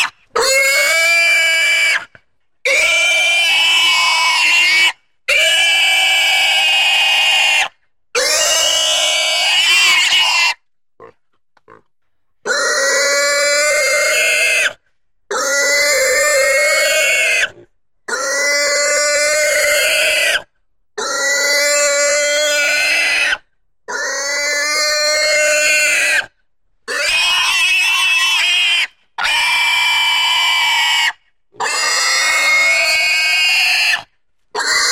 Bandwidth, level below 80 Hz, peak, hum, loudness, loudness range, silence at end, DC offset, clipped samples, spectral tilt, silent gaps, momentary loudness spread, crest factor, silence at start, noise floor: 16.5 kHz; -54 dBFS; -2 dBFS; none; -12 LUFS; 4 LU; 0 s; 0.1%; under 0.1%; 2.5 dB/octave; none; 8 LU; 12 dB; 0 s; -74 dBFS